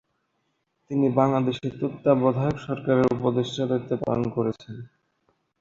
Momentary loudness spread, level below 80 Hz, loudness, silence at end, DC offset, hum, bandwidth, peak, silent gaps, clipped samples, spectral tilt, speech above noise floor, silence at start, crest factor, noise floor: 9 LU; -58 dBFS; -24 LUFS; 0.75 s; under 0.1%; none; 7.6 kHz; -6 dBFS; none; under 0.1%; -8 dB/octave; 50 dB; 0.9 s; 20 dB; -74 dBFS